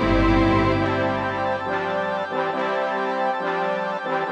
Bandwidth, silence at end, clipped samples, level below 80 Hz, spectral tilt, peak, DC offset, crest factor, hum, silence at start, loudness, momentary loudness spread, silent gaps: 9 kHz; 0 s; under 0.1%; -34 dBFS; -7 dB/octave; -6 dBFS; under 0.1%; 16 dB; none; 0 s; -22 LUFS; 6 LU; none